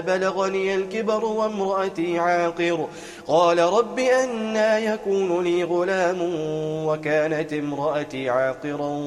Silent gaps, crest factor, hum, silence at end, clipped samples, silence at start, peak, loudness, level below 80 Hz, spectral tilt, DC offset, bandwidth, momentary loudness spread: none; 18 dB; none; 0 s; under 0.1%; 0 s; -6 dBFS; -23 LUFS; -62 dBFS; -5 dB/octave; under 0.1%; 12.5 kHz; 6 LU